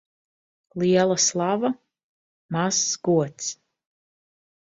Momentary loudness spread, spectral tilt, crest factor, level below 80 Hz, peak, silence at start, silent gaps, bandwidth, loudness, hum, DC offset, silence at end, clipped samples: 13 LU; -3.5 dB/octave; 18 dB; -68 dBFS; -8 dBFS; 0.75 s; 2.03-2.49 s; 8 kHz; -23 LUFS; none; under 0.1%; 1.15 s; under 0.1%